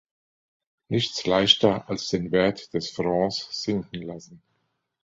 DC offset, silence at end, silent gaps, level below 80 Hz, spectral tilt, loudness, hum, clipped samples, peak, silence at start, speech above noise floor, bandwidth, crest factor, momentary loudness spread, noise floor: under 0.1%; 0.65 s; none; -56 dBFS; -4.5 dB/octave; -24 LUFS; none; under 0.1%; -2 dBFS; 0.9 s; 50 dB; 7.8 kHz; 24 dB; 15 LU; -75 dBFS